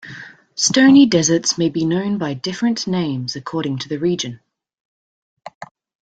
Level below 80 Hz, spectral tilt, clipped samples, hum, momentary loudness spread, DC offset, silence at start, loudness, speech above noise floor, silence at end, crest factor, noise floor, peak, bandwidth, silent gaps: -58 dBFS; -4 dB/octave; under 0.1%; none; 20 LU; under 0.1%; 0.05 s; -17 LUFS; 21 dB; 0.4 s; 16 dB; -38 dBFS; -2 dBFS; 9.2 kHz; 4.80-5.37 s, 5.55-5.61 s